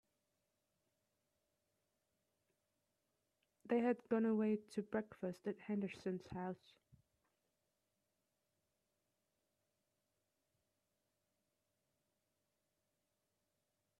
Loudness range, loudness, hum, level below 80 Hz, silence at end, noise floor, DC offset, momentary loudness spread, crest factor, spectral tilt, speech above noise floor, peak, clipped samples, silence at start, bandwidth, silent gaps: 11 LU; -42 LUFS; none; -84 dBFS; 7.45 s; -88 dBFS; under 0.1%; 10 LU; 22 dB; -8 dB/octave; 47 dB; -26 dBFS; under 0.1%; 3.65 s; 11 kHz; none